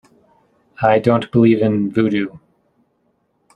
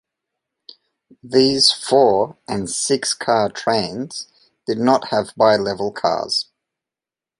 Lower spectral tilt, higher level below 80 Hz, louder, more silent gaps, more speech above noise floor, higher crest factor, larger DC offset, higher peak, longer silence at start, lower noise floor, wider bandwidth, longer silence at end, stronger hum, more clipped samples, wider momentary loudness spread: first, -9 dB/octave vs -3.5 dB/octave; about the same, -56 dBFS vs -58 dBFS; about the same, -16 LUFS vs -18 LUFS; neither; second, 49 dB vs 71 dB; about the same, 18 dB vs 20 dB; neither; about the same, 0 dBFS vs 0 dBFS; second, 0.8 s vs 1.25 s; second, -64 dBFS vs -89 dBFS; second, 9 kHz vs 11.5 kHz; first, 1.2 s vs 0.95 s; neither; neither; second, 7 LU vs 13 LU